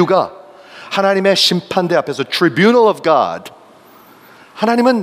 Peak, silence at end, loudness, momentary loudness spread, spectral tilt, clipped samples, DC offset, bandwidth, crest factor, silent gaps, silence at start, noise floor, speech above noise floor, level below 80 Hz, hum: 0 dBFS; 0 s; -14 LUFS; 9 LU; -4.5 dB/octave; under 0.1%; under 0.1%; 16 kHz; 14 dB; none; 0 s; -43 dBFS; 30 dB; -64 dBFS; none